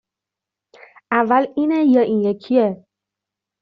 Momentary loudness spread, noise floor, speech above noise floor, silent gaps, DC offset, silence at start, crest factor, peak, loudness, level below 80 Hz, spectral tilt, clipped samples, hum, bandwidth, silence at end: 7 LU; -86 dBFS; 69 dB; none; under 0.1%; 1.1 s; 18 dB; -2 dBFS; -17 LUFS; -66 dBFS; -5.5 dB/octave; under 0.1%; none; 5.4 kHz; 0.85 s